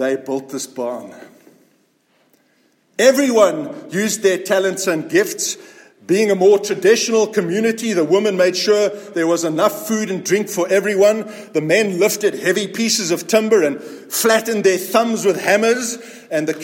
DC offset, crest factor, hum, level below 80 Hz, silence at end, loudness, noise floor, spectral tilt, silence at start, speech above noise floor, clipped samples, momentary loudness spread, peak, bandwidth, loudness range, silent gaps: under 0.1%; 16 dB; none; -70 dBFS; 0 s; -17 LUFS; -60 dBFS; -3.5 dB/octave; 0 s; 43 dB; under 0.1%; 10 LU; 0 dBFS; 17 kHz; 3 LU; none